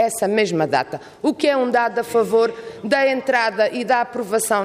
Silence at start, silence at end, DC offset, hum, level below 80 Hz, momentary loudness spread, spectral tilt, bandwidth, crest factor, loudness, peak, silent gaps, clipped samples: 0 s; 0 s; under 0.1%; none; -64 dBFS; 5 LU; -4 dB/octave; 15.5 kHz; 14 dB; -19 LUFS; -6 dBFS; none; under 0.1%